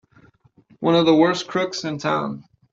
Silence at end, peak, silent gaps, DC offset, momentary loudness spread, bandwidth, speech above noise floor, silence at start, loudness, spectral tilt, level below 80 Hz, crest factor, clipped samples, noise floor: 0.3 s; -4 dBFS; none; under 0.1%; 11 LU; 7.6 kHz; 36 dB; 0.8 s; -20 LUFS; -5.5 dB/octave; -64 dBFS; 18 dB; under 0.1%; -55 dBFS